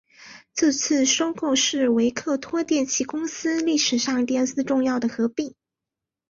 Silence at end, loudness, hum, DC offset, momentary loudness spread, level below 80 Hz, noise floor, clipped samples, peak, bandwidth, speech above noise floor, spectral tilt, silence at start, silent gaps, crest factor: 0.8 s; -22 LUFS; none; under 0.1%; 7 LU; -64 dBFS; -87 dBFS; under 0.1%; -8 dBFS; 7.6 kHz; 65 dB; -2 dB/octave; 0.2 s; none; 16 dB